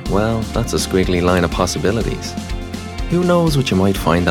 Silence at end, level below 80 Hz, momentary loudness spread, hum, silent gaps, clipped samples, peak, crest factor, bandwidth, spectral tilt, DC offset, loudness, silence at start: 0 s; -28 dBFS; 12 LU; none; none; under 0.1%; -2 dBFS; 14 dB; 17 kHz; -5.5 dB/octave; under 0.1%; -17 LUFS; 0 s